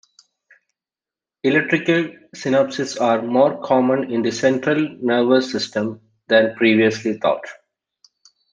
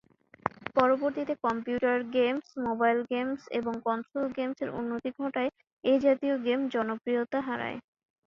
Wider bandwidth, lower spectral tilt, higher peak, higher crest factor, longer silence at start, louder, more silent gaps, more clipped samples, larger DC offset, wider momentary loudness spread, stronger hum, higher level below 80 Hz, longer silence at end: first, 9.6 kHz vs 7.2 kHz; second, -5 dB/octave vs -6.5 dB/octave; first, -2 dBFS vs -6 dBFS; about the same, 18 dB vs 22 dB; first, 1.45 s vs 0.45 s; first, -19 LUFS vs -30 LUFS; second, none vs 5.72-5.77 s; neither; neither; about the same, 8 LU vs 9 LU; neither; about the same, -68 dBFS vs -68 dBFS; first, 1 s vs 0.45 s